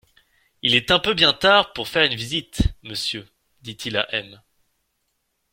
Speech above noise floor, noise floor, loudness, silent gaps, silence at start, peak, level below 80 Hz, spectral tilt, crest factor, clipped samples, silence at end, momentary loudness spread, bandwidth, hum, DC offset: 52 dB; -73 dBFS; -20 LUFS; none; 0.65 s; -2 dBFS; -38 dBFS; -3.5 dB/octave; 22 dB; under 0.1%; 1.2 s; 14 LU; 16.5 kHz; none; under 0.1%